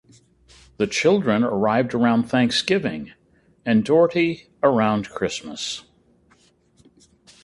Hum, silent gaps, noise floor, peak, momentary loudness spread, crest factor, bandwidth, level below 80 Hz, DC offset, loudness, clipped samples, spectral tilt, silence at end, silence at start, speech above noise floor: none; none; -59 dBFS; -4 dBFS; 11 LU; 20 dB; 11.5 kHz; -56 dBFS; under 0.1%; -21 LUFS; under 0.1%; -5 dB/octave; 1.65 s; 0.8 s; 39 dB